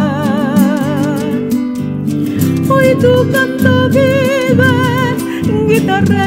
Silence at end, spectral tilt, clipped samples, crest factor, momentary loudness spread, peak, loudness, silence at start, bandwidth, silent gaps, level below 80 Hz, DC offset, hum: 0 s; -6.5 dB/octave; under 0.1%; 12 dB; 6 LU; 0 dBFS; -12 LUFS; 0 s; 16.5 kHz; none; -46 dBFS; under 0.1%; none